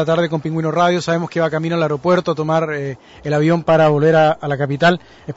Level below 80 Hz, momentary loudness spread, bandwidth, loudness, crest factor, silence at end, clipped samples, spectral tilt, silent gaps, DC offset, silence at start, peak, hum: -52 dBFS; 9 LU; 8 kHz; -16 LUFS; 12 dB; 0.05 s; under 0.1%; -6.5 dB/octave; none; under 0.1%; 0 s; -4 dBFS; none